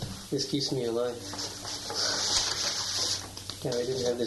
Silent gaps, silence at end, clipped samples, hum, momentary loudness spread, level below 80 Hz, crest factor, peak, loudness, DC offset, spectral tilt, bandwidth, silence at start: none; 0 s; under 0.1%; none; 10 LU; -56 dBFS; 20 dB; -12 dBFS; -29 LUFS; under 0.1%; -2.5 dB/octave; 12 kHz; 0 s